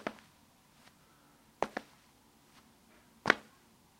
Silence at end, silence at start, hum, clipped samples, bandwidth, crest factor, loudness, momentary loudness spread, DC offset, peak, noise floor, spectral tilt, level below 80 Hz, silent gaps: 0.6 s; 0.05 s; none; under 0.1%; 16 kHz; 38 dB; -35 LUFS; 24 LU; under 0.1%; -4 dBFS; -65 dBFS; -3.5 dB/octave; -74 dBFS; none